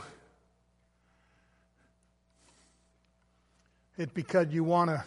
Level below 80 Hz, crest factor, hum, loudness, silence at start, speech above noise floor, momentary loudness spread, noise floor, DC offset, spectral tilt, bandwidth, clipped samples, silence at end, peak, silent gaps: -72 dBFS; 22 dB; 60 Hz at -70 dBFS; -30 LUFS; 0 s; 42 dB; 22 LU; -71 dBFS; under 0.1%; -7.5 dB/octave; 11.5 kHz; under 0.1%; 0 s; -12 dBFS; none